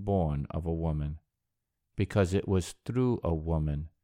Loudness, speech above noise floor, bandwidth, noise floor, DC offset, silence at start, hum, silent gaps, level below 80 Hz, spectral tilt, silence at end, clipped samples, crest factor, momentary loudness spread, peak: -31 LUFS; 54 dB; 15 kHz; -84 dBFS; under 0.1%; 0 s; none; none; -42 dBFS; -7.5 dB/octave; 0.15 s; under 0.1%; 20 dB; 7 LU; -12 dBFS